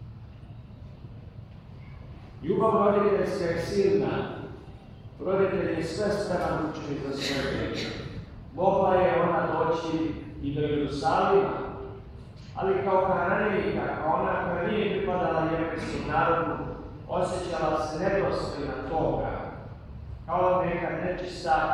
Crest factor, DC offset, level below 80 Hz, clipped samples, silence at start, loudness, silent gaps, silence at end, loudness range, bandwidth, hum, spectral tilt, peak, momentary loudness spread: 18 dB; under 0.1%; -48 dBFS; under 0.1%; 0 s; -27 LUFS; none; 0 s; 3 LU; 12 kHz; none; -6.5 dB/octave; -8 dBFS; 21 LU